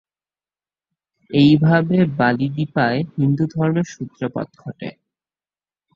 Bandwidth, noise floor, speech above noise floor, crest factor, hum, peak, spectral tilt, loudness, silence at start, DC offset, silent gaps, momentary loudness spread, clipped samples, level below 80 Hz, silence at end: 7.2 kHz; under -90 dBFS; over 72 dB; 18 dB; none; -2 dBFS; -7.5 dB/octave; -18 LUFS; 1.3 s; under 0.1%; none; 18 LU; under 0.1%; -56 dBFS; 1.05 s